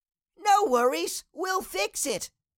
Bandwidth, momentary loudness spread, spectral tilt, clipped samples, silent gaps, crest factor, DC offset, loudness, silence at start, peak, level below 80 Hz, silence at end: 17 kHz; 11 LU; -1.5 dB/octave; under 0.1%; none; 16 dB; under 0.1%; -26 LUFS; 0.4 s; -12 dBFS; -64 dBFS; 0.3 s